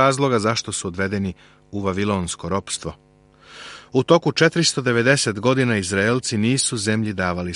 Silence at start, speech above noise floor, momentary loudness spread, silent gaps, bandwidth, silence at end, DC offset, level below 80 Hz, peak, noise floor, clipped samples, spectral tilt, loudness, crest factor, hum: 0 s; 30 dB; 11 LU; none; 11.5 kHz; 0 s; under 0.1%; -52 dBFS; -2 dBFS; -50 dBFS; under 0.1%; -4.5 dB/octave; -20 LUFS; 18 dB; none